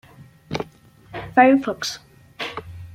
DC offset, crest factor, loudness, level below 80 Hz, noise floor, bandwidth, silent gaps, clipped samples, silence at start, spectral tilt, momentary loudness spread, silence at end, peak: under 0.1%; 22 dB; -21 LUFS; -54 dBFS; -49 dBFS; 15 kHz; none; under 0.1%; 0.2 s; -4.5 dB/octave; 21 LU; 0.05 s; -2 dBFS